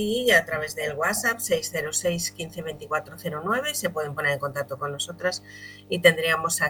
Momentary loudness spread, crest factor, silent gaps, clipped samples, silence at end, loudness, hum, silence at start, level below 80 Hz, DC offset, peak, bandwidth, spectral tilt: 14 LU; 24 dB; none; under 0.1%; 0 s; -25 LUFS; 50 Hz at -50 dBFS; 0 s; -58 dBFS; under 0.1%; -2 dBFS; 19 kHz; -2.5 dB/octave